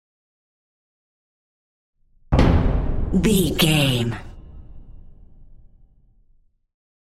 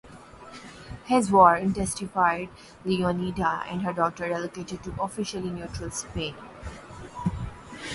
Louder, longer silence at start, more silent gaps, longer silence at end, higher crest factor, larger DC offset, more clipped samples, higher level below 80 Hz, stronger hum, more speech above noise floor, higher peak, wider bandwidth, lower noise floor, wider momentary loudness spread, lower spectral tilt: first, -19 LUFS vs -26 LUFS; first, 2.3 s vs 0.05 s; neither; first, 1.6 s vs 0 s; about the same, 20 dB vs 24 dB; neither; neither; first, -30 dBFS vs -48 dBFS; neither; first, 40 dB vs 21 dB; about the same, -4 dBFS vs -4 dBFS; first, 16 kHz vs 11.5 kHz; first, -58 dBFS vs -46 dBFS; second, 10 LU vs 21 LU; about the same, -5.5 dB/octave vs -5 dB/octave